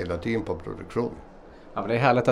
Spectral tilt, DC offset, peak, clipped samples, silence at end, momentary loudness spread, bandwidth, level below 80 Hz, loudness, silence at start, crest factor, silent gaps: -7.5 dB/octave; under 0.1%; -6 dBFS; under 0.1%; 0 s; 13 LU; 11 kHz; -50 dBFS; -27 LUFS; 0 s; 22 dB; none